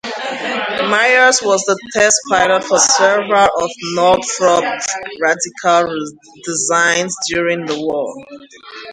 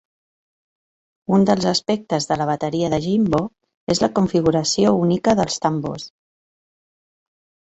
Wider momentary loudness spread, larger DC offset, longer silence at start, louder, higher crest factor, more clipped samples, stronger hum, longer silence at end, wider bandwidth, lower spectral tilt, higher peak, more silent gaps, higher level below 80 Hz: about the same, 12 LU vs 12 LU; neither; second, 0.05 s vs 1.3 s; first, -14 LUFS vs -19 LUFS; about the same, 16 dB vs 18 dB; neither; neither; second, 0 s vs 1.6 s; first, 11 kHz vs 8.2 kHz; second, -1.5 dB/octave vs -5.5 dB/octave; about the same, 0 dBFS vs -2 dBFS; second, none vs 3.74-3.87 s; about the same, -54 dBFS vs -50 dBFS